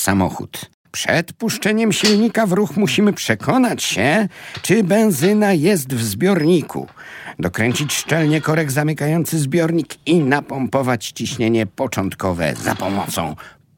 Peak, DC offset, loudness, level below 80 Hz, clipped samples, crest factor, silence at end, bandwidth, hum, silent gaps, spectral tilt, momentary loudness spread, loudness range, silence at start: 0 dBFS; under 0.1%; -18 LUFS; -52 dBFS; under 0.1%; 18 dB; 0.25 s; 17.5 kHz; none; 0.74-0.84 s; -5 dB/octave; 10 LU; 3 LU; 0 s